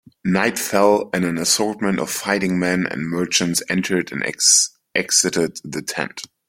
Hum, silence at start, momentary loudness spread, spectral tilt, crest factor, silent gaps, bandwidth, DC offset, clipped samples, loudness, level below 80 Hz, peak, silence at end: none; 0.25 s; 10 LU; -2.5 dB/octave; 18 dB; none; 16.5 kHz; under 0.1%; under 0.1%; -19 LUFS; -58 dBFS; -2 dBFS; 0.25 s